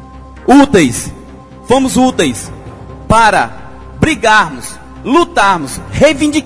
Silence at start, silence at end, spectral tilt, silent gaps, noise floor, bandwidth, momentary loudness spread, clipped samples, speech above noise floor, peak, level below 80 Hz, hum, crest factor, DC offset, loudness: 0 s; 0 s; -4.5 dB/octave; none; -33 dBFS; 11 kHz; 17 LU; 0.4%; 23 dB; 0 dBFS; -32 dBFS; none; 12 dB; under 0.1%; -10 LUFS